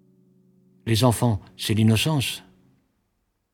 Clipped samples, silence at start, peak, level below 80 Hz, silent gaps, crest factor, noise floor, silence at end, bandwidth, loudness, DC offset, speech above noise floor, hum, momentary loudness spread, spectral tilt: under 0.1%; 0.85 s; -4 dBFS; -52 dBFS; none; 20 dB; -73 dBFS; 1.15 s; 18 kHz; -22 LUFS; under 0.1%; 52 dB; none; 11 LU; -5.5 dB/octave